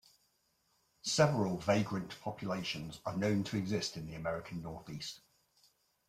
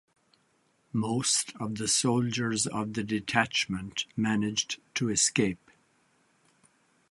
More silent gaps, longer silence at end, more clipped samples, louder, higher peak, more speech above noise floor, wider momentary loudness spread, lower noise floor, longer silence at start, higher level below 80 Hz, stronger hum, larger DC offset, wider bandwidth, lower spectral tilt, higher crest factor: neither; second, 0.9 s vs 1.55 s; neither; second, -36 LUFS vs -28 LUFS; second, -14 dBFS vs -8 dBFS; about the same, 41 dB vs 41 dB; first, 14 LU vs 8 LU; first, -76 dBFS vs -70 dBFS; about the same, 1.05 s vs 0.95 s; about the same, -66 dBFS vs -62 dBFS; neither; neither; first, 15 kHz vs 11.5 kHz; first, -5 dB/octave vs -3 dB/octave; about the same, 22 dB vs 24 dB